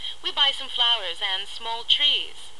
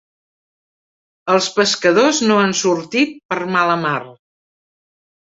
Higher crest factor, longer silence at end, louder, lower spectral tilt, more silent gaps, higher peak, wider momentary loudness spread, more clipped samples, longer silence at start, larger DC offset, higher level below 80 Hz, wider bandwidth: about the same, 18 dB vs 18 dB; second, 0.1 s vs 1.25 s; second, -22 LUFS vs -16 LUFS; second, 0.5 dB/octave vs -3.5 dB/octave; second, none vs 3.25-3.29 s; second, -6 dBFS vs -2 dBFS; about the same, 10 LU vs 8 LU; neither; second, 0 s vs 1.25 s; first, 2% vs under 0.1%; about the same, -60 dBFS vs -62 dBFS; first, 12 kHz vs 8 kHz